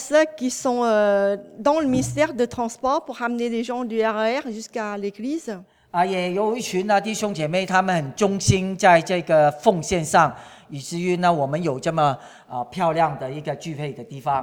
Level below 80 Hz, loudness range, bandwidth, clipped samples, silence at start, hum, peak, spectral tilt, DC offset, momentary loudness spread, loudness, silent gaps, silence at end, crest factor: -52 dBFS; 5 LU; 17.5 kHz; under 0.1%; 0 s; none; -2 dBFS; -5 dB/octave; under 0.1%; 12 LU; -22 LUFS; none; 0 s; 20 dB